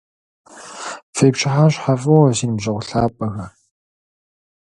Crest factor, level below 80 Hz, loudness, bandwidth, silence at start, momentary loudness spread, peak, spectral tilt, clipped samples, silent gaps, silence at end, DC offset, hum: 18 dB; -48 dBFS; -17 LUFS; 11.5 kHz; 0.55 s; 18 LU; 0 dBFS; -6 dB/octave; under 0.1%; 1.03-1.13 s; 1.3 s; under 0.1%; none